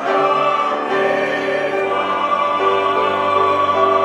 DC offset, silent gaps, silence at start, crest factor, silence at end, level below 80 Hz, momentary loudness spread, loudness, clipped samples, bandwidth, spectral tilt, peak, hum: under 0.1%; none; 0 s; 14 dB; 0 s; -66 dBFS; 4 LU; -16 LUFS; under 0.1%; 11 kHz; -4.5 dB/octave; -2 dBFS; none